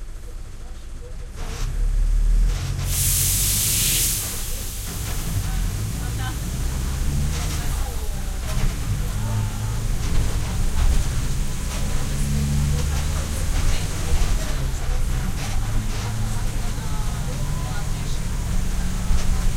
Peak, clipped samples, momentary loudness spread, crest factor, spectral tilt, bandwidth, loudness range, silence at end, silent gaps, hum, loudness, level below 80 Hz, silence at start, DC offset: -8 dBFS; under 0.1%; 11 LU; 14 dB; -3.5 dB/octave; 16.5 kHz; 6 LU; 0 s; none; none; -25 LUFS; -24 dBFS; 0 s; under 0.1%